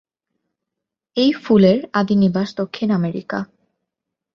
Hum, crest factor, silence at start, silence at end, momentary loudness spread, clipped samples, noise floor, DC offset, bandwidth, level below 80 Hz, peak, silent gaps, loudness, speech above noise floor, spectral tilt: none; 18 dB; 1.15 s; 0.9 s; 14 LU; under 0.1%; -83 dBFS; under 0.1%; 6.8 kHz; -58 dBFS; -2 dBFS; none; -18 LUFS; 66 dB; -8 dB/octave